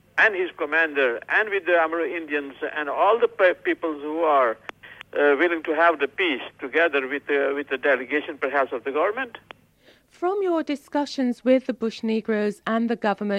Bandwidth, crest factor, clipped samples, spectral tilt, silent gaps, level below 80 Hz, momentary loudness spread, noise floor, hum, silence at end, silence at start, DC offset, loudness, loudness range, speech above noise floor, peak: 11.5 kHz; 18 dB; under 0.1%; -5.5 dB/octave; none; -70 dBFS; 8 LU; -57 dBFS; none; 0 s; 0.15 s; under 0.1%; -23 LUFS; 4 LU; 34 dB; -6 dBFS